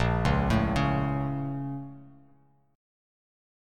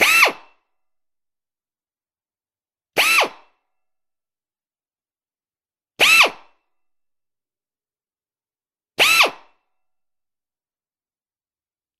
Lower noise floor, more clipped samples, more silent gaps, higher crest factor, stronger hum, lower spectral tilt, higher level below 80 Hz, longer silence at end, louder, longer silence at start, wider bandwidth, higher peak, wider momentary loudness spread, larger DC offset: second, -63 dBFS vs under -90 dBFS; neither; neither; second, 18 dB vs 24 dB; neither; first, -7.5 dB/octave vs 1 dB/octave; first, -38 dBFS vs -68 dBFS; second, 1.65 s vs 2.7 s; second, -28 LUFS vs -14 LUFS; about the same, 0 s vs 0 s; second, 10.5 kHz vs 15.5 kHz; second, -12 dBFS vs 0 dBFS; about the same, 12 LU vs 12 LU; neither